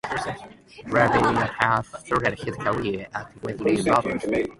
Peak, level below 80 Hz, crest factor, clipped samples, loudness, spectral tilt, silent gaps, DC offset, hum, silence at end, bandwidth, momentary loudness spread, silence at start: -2 dBFS; -50 dBFS; 22 dB; under 0.1%; -24 LUFS; -6 dB/octave; none; under 0.1%; none; 0.05 s; 11.5 kHz; 13 LU; 0.05 s